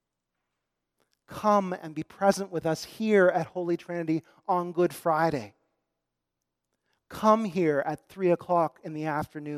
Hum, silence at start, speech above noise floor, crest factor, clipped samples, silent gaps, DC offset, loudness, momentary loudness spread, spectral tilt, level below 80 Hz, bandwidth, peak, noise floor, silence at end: none; 1.3 s; 58 dB; 22 dB; under 0.1%; none; under 0.1%; -27 LUFS; 11 LU; -6.5 dB/octave; -68 dBFS; 15.5 kHz; -8 dBFS; -85 dBFS; 0 s